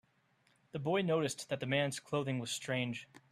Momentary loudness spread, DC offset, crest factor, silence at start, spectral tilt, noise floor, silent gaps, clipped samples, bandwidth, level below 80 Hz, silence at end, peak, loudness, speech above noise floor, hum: 8 LU; under 0.1%; 18 dB; 0.75 s; -4.5 dB/octave; -73 dBFS; none; under 0.1%; 14 kHz; -76 dBFS; 0.3 s; -20 dBFS; -36 LUFS; 37 dB; none